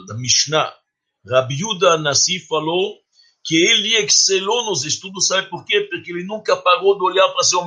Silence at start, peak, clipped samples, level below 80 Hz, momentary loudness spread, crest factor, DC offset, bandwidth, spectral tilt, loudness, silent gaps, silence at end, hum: 0 s; 0 dBFS; under 0.1%; -64 dBFS; 10 LU; 18 dB; under 0.1%; 11 kHz; -2 dB/octave; -16 LUFS; none; 0 s; none